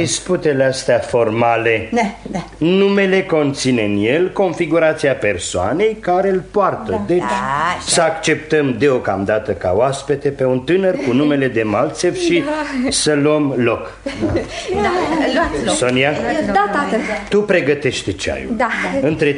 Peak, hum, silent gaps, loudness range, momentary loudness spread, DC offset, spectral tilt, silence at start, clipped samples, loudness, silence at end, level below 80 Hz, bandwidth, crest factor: 0 dBFS; none; none; 1 LU; 5 LU; under 0.1%; -4.5 dB/octave; 0 s; under 0.1%; -16 LUFS; 0 s; -42 dBFS; 11 kHz; 16 dB